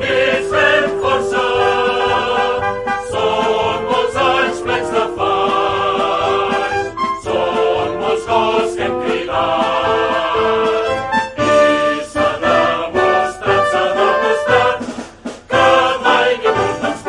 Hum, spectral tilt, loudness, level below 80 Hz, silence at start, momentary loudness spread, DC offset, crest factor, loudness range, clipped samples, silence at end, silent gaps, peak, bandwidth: none; -4 dB/octave; -15 LUFS; -44 dBFS; 0 s; 6 LU; under 0.1%; 16 dB; 2 LU; under 0.1%; 0 s; none; 0 dBFS; 11.5 kHz